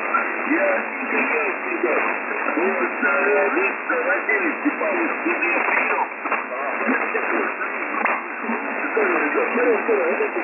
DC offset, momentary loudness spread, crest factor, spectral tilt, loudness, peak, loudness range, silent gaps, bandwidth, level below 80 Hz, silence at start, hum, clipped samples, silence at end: under 0.1%; 6 LU; 14 dB; -7.5 dB/octave; -21 LUFS; -8 dBFS; 2 LU; none; 3 kHz; under -90 dBFS; 0 s; none; under 0.1%; 0 s